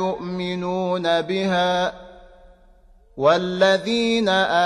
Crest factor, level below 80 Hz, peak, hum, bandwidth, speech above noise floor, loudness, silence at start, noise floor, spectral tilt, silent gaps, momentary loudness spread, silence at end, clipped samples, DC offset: 18 dB; -52 dBFS; -4 dBFS; none; 11 kHz; 31 dB; -21 LUFS; 0 s; -51 dBFS; -5 dB/octave; none; 8 LU; 0 s; under 0.1%; under 0.1%